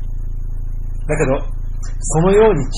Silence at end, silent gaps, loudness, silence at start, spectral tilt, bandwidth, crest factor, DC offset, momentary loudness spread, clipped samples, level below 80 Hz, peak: 0 s; none; -16 LUFS; 0 s; -6 dB/octave; 11.5 kHz; 14 dB; 2%; 17 LU; under 0.1%; -22 dBFS; -2 dBFS